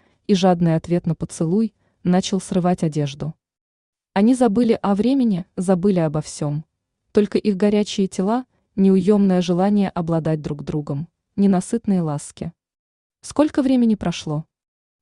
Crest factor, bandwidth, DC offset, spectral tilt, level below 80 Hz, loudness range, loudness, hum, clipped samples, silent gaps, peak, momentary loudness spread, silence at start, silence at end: 16 dB; 11 kHz; under 0.1%; -7 dB/octave; -52 dBFS; 4 LU; -20 LUFS; none; under 0.1%; 3.61-3.93 s, 12.79-13.10 s; -4 dBFS; 11 LU; 0.3 s; 0.6 s